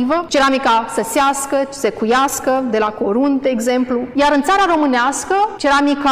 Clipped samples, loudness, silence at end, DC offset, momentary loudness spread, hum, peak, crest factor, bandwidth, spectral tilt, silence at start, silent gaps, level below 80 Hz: under 0.1%; -15 LUFS; 0 s; 0.2%; 5 LU; none; -6 dBFS; 10 dB; 16 kHz; -3 dB/octave; 0 s; none; -46 dBFS